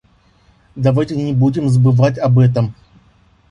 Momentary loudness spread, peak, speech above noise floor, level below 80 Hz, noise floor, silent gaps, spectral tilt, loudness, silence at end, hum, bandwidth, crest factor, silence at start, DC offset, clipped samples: 6 LU; -2 dBFS; 39 dB; -46 dBFS; -52 dBFS; none; -9 dB/octave; -15 LUFS; 0.8 s; none; 10 kHz; 14 dB; 0.75 s; under 0.1%; under 0.1%